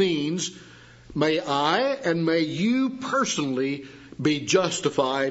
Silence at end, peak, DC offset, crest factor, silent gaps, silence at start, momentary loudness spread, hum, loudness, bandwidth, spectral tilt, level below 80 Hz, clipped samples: 0 s; -6 dBFS; under 0.1%; 18 dB; none; 0 s; 8 LU; none; -24 LUFS; 8 kHz; -4 dB/octave; -60 dBFS; under 0.1%